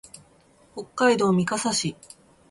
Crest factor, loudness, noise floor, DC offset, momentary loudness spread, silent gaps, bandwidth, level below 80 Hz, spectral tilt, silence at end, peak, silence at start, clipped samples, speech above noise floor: 18 dB; -23 LUFS; -57 dBFS; under 0.1%; 19 LU; none; 11.5 kHz; -62 dBFS; -4 dB/octave; 0.55 s; -8 dBFS; 0.75 s; under 0.1%; 34 dB